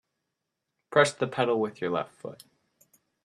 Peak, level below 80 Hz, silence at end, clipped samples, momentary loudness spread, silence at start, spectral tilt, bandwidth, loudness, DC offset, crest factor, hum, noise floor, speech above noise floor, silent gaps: -6 dBFS; -74 dBFS; 0.9 s; under 0.1%; 17 LU; 0.9 s; -4.5 dB/octave; 13.5 kHz; -27 LUFS; under 0.1%; 24 dB; none; -84 dBFS; 56 dB; none